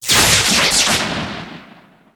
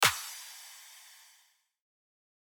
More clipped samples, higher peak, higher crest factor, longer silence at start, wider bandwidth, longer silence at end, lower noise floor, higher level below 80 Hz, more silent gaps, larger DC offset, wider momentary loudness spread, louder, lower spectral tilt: neither; first, 0 dBFS vs -10 dBFS; second, 16 dB vs 26 dB; about the same, 0 s vs 0 s; about the same, over 20 kHz vs over 20 kHz; second, 0.5 s vs 1.4 s; second, -45 dBFS vs -68 dBFS; first, -38 dBFS vs -74 dBFS; neither; neither; about the same, 18 LU vs 20 LU; first, -12 LUFS vs -35 LUFS; about the same, -1 dB/octave vs 0 dB/octave